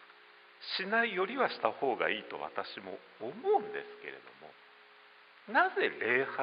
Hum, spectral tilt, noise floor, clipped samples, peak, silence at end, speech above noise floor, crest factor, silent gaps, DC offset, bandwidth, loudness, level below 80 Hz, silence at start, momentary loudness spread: none; -1 dB/octave; -59 dBFS; under 0.1%; -12 dBFS; 0 s; 25 dB; 22 dB; none; under 0.1%; 5.2 kHz; -33 LUFS; -86 dBFS; 0 s; 17 LU